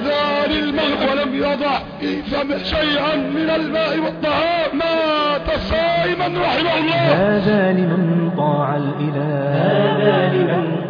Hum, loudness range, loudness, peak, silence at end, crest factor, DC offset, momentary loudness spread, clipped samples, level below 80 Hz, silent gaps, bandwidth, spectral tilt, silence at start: none; 2 LU; -18 LUFS; -2 dBFS; 0 s; 16 dB; under 0.1%; 5 LU; under 0.1%; -40 dBFS; none; 5.4 kHz; -8 dB/octave; 0 s